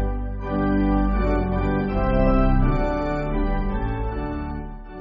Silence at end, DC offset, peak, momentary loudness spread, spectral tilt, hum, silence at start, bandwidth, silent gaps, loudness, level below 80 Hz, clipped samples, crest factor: 0 s; under 0.1%; -6 dBFS; 9 LU; -7.5 dB/octave; none; 0 s; 5.6 kHz; none; -23 LUFS; -24 dBFS; under 0.1%; 14 dB